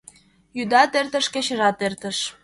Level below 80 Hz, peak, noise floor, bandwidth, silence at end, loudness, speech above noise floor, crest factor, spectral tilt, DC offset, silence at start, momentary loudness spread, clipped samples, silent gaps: -64 dBFS; -4 dBFS; -51 dBFS; 11.5 kHz; 0.1 s; -21 LUFS; 29 dB; 20 dB; -2.5 dB/octave; under 0.1%; 0.55 s; 10 LU; under 0.1%; none